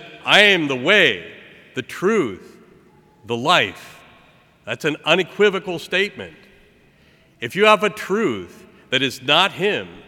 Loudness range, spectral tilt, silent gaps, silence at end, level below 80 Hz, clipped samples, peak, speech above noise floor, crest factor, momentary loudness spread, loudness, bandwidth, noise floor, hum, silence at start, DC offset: 5 LU; -3.5 dB/octave; none; 0.05 s; -64 dBFS; under 0.1%; 0 dBFS; 35 dB; 20 dB; 17 LU; -17 LUFS; 16.5 kHz; -54 dBFS; none; 0 s; under 0.1%